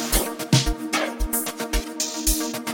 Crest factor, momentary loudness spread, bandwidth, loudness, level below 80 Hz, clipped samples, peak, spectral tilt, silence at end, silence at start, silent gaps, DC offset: 20 dB; 6 LU; 17 kHz; -23 LUFS; -30 dBFS; under 0.1%; -4 dBFS; -3.5 dB/octave; 0 s; 0 s; none; under 0.1%